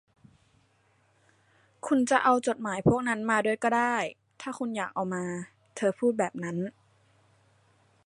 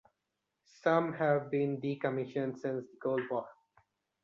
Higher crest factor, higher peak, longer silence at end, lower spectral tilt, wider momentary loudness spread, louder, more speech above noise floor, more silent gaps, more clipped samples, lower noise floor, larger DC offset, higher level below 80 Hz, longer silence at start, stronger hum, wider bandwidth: about the same, 22 dB vs 20 dB; first, -8 dBFS vs -14 dBFS; first, 1.35 s vs 0.7 s; second, -5.5 dB/octave vs -8 dB/octave; first, 15 LU vs 8 LU; first, -28 LUFS vs -34 LUFS; second, 40 dB vs 53 dB; neither; neither; second, -67 dBFS vs -86 dBFS; neither; first, -62 dBFS vs -78 dBFS; first, 1.85 s vs 0.85 s; neither; first, 11.5 kHz vs 7.4 kHz